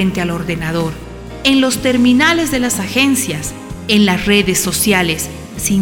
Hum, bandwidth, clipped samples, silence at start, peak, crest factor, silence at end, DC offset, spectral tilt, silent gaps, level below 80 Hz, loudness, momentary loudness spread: none; 18 kHz; under 0.1%; 0 s; 0 dBFS; 14 dB; 0 s; under 0.1%; -3.5 dB/octave; none; -36 dBFS; -14 LUFS; 12 LU